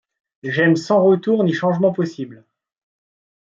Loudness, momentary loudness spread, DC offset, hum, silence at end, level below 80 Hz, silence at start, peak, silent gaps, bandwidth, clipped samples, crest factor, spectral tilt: -17 LUFS; 17 LU; under 0.1%; none; 1.1 s; -66 dBFS; 0.45 s; -4 dBFS; none; 7.6 kHz; under 0.1%; 14 dB; -7 dB/octave